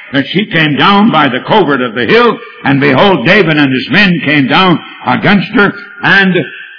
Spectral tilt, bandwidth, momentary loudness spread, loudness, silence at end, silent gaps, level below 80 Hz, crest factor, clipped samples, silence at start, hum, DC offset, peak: -7 dB/octave; 5.4 kHz; 6 LU; -8 LUFS; 0 s; none; -44 dBFS; 8 dB; 2%; 0 s; none; 0.8%; 0 dBFS